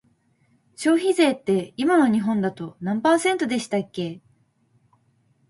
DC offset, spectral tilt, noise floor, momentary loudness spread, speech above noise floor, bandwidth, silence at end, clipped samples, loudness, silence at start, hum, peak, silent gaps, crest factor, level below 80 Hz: under 0.1%; -5 dB/octave; -64 dBFS; 12 LU; 42 dB; 11.5 kHz; 1.3 s; under 0.1%; -22 LUFS; 0.8 s; none; -6 dBFS; none; 18 dB; -68 dBFS